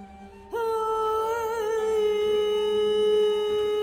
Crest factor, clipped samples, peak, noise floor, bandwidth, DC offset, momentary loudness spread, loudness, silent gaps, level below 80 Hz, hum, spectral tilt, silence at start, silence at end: 10 dB; under 0.1%; -16 dBFS; -45 dBFS; 16 kHz; under 0.1%; 5 LU; -25 LUFS; none; -56 dBFS; none; -3.5 dB/octave; 0 s; 0 s